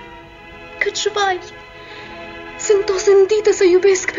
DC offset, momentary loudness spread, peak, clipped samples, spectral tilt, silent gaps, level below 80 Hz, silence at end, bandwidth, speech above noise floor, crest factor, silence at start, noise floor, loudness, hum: under 0.1%; 23 LU; -4 dBFS; under 0.1%; -2.5 dB/octave; none; -50 dBFS; 0 s; 7.6 kHz; 23 dB; 14 dB; 0 s; -38 dBFS; -15 LUFS; none